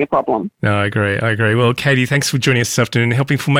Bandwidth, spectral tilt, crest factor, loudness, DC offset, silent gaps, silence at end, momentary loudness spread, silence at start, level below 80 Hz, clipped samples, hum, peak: 16.5 kHz; -5 dB/octave; 10 dB; -16 LUFS; under 0.1%; none; 0 s; 3 LU; 0 s; -52 dBFS; under 0.1%; none; -6 dBFS